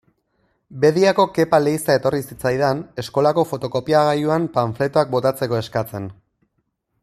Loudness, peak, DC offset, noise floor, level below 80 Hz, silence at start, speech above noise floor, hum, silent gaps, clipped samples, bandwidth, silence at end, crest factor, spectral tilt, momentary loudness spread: -19 LUFS; -2 dBFS; under 0.1%; -71 dBFS; -56 dBFS; 0.7 s; 53 dB; none; none; under 0.1%; 15 kHz; 0.9 s; 18 dB; -6 dB/octave; 9 LU